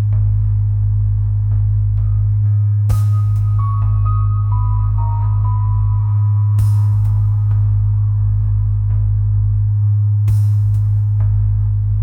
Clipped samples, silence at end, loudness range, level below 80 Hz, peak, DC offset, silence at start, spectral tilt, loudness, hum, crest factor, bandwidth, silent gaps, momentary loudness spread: under 0.1%; 0 s; 1 LU; -22 dBFS; -6 dBFS; 0.2%; 0 s; -9.5 dB/octave; -16 LUFS; none; 8 dB; 1.5 kHz; none; 2 LU